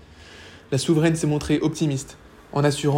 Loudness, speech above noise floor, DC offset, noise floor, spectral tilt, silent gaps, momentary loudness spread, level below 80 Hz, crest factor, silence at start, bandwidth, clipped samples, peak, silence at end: -23 LUFS; 23 dB; under 0.1%; -45 dBFS; -6 dB/octave; none; 22 LU; -48 dBFS; 16 dB; 0.2 s; 16 kHz; under 0.1%; -8 dBFS; 0 s